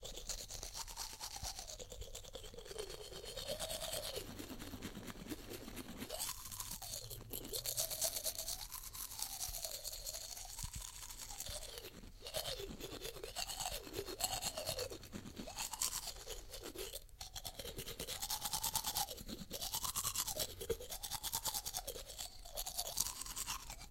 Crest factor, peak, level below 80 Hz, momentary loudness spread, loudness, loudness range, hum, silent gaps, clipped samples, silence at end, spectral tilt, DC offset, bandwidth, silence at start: 32 dB; -12 dBFS; -56 dBFS; 11 LU; -43 LUFS; 6 LU; none; none; under 0.1%; 0 s; -1.5 dB/octave; under 0.1%; 17 kHz; 0 s